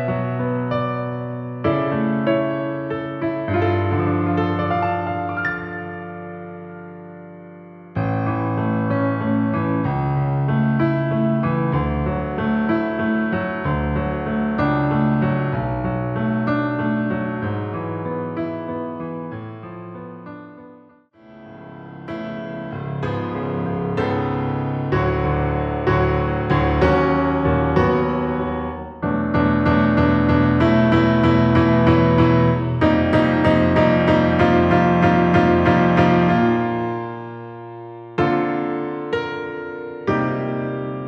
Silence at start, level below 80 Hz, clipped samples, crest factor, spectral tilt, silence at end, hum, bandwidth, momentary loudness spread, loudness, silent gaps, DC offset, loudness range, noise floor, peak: 0 s; -36 dBFS; under 0.1%; 16 dB; -9 dB/octave; 0 s; none; 6.8 kHz; 16 LU; -20 LUFS; none; under 0.1%; 12 LU; -49 dBFS; -2 dBFS